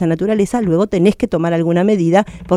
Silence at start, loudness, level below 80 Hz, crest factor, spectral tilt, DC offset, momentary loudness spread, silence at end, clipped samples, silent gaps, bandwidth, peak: 0 s; -15 LUFS; -42 dBFS; 14 dB; -7.5 dB/octave; under 0.1%; 3 LU; 0 s; under 0.1%; none; 12 kHz; -2 dBFS